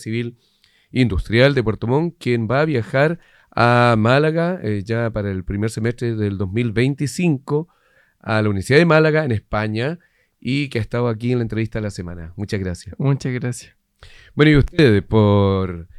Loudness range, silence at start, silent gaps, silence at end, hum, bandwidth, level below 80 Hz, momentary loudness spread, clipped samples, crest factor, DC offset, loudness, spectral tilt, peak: 6 LU; 0 s; none; 0 s; none; 12.5 kHz; -38 dBFS; 13 LU; under 0.1%; 18 dB; under 0.1%; -19 LUFS; -7 dB/octave; 0 dBFS